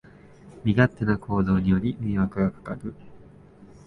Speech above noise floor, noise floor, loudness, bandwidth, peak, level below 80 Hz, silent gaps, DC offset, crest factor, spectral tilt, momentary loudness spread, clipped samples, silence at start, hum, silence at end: 25 dB; -49 dBFS; -25 LUFS; 4.6 kHz; -6 dBFS; -44 dBFS; none; under 0.1%; 20 dB; -9.5 dB/octave; 14 LU; under 0.1%; 0.45 s; none; 0.2 s